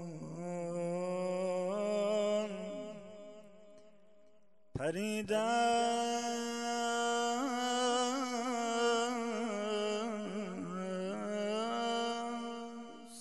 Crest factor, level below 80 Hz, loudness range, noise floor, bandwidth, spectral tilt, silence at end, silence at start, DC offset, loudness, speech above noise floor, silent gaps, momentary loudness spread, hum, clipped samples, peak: 16 dB; -72 dBFS; 5 LU; -69 dBFS; 12.5 kHz; -4 dB/octave; 0 s; 0 s; 0.1%; -35 LUFS; 37 dB; none; 12 LU; none; under 0.1%; -20 dBFS